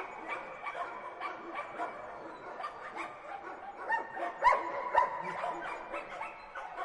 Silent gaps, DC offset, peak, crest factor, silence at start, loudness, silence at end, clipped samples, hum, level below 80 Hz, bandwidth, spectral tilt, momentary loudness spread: none; under 0.1%; -16 dBFS; 22 dB; 0 s; -36 LUFS; 0 s; under 0.1%; none; -66 dBFS; 11 kHz; -4 dB/octave; 15 LU